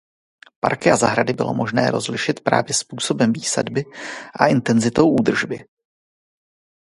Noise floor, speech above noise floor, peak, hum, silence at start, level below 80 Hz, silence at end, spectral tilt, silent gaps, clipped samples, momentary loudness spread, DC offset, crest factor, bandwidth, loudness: under -90 dBFS; over 71 dB; 0 dBFS; none; 0.65 s; -56 dBFS; 1.2 s; -4.5 dB/octave; none; under 0.1%; 10 LU; under 0.1%; 20 dB; 11.5 kHz; -19 LUFS